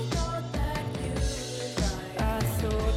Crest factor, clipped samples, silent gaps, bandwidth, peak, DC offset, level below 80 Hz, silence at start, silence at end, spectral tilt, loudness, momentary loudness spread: 14 dB; under 0.1%; none; 16 kHz; -16 dBFS; under 0.1%; -34 dBFS; 0 s; 0 s; -5 dB/octave; -31 LUFS; 4 LU